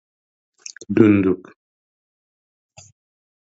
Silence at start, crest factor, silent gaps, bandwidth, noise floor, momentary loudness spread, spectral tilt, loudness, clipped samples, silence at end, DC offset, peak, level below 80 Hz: 0.9 s; 22 dB; none; 8 kHz; under -90 dBFS; 24 LU; -7.5 dB/octave; -17 LUFS; under 0.1%; 2.25 s; under 0.1%; 0 dBFS; -54 dBFS